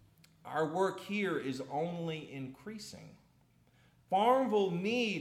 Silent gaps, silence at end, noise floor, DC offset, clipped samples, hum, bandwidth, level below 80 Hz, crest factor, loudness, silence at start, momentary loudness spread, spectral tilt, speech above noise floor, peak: none; 0 s; -68 dBFS; under 0.1%; under 0.1%; none; 15 kHz; -76 dBFS; 18 dB; -34 LUFS; 0.45 s; 17 LU; -5.5 dB/octave; 34 dB; -16 dBFS